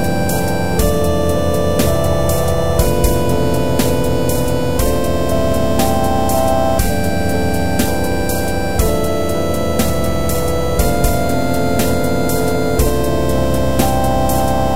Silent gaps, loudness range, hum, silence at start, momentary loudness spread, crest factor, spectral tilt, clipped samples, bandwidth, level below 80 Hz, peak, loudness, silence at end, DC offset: none; 2 LU; none; 0 s; 2 LU; 14 dB; -5.5 dB/octave; under 0.1%; 16.5 kHz; -24 dBFS; 0 dBFS; -16 LUFS; 0 s; 10%